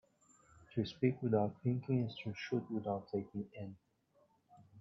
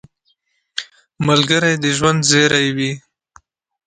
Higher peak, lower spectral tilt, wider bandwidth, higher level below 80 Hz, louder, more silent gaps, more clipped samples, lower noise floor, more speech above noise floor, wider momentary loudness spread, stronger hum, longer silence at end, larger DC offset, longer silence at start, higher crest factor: second, -20 dBFS vs 0 dBFS; first, -7 dB/octave vs -3.5 dB/octave; second, 7.6 kHz vs 9.6 kHz; second, -76 dBFS vs -52 dBFS; second, -39 LUFS vs -15 LUFS; neither; neither; first, -74 dBFS vs -65 dBFS; second, 36 dB vs 50 dB; second, 11 LU vs 16 LU; neither; second, 0 s vs 0.9 s; neither; second, 0.6 s vs 0.75 s; about the same, 20 dB vs 18 dB